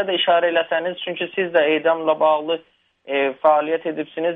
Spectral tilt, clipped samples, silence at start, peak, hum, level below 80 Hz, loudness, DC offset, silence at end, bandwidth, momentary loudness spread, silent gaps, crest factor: -7 dB/octave; under 0.1%; 0 s; -2 dBFS; none; -72 dBFS; -20 LUFS; under 0.1%; 0 s; 3.9 kHz; 9 LU; none; 16 dB